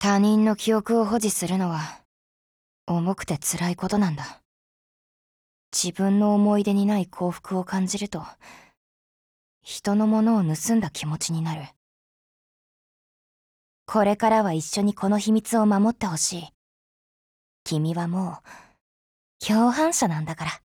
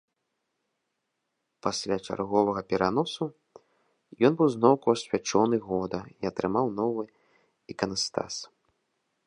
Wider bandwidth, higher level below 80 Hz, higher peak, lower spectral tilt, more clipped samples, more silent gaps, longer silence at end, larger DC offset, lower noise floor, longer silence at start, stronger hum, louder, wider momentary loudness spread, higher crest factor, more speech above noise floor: first, 17 kHz vs 11 kHz; about the same, -60 dBFS vs -62 dBFS; about the same, -8 dBFS vs -6 dBFS; about the same, -5 dB/octave vs -5 dB/octave; neither; first, 2.05-2.87 s, 4.45-5.72 s, 8.77-9.61 s, 11.76-13.86 s, 16.54-17.66 s, 18.81-19.40 s vs none; second, 0.1 s vs 0.8 s; neither; first, under -90 dBFS vs -81 dBFS; second, 0 s vs 1.65 s; neither; first, -23 LUFS vs -28 LUFS; about the same, 12 LU vs 13 LU; second, 16 dB vs 24 dB; first, over 67 dB vs 54 dB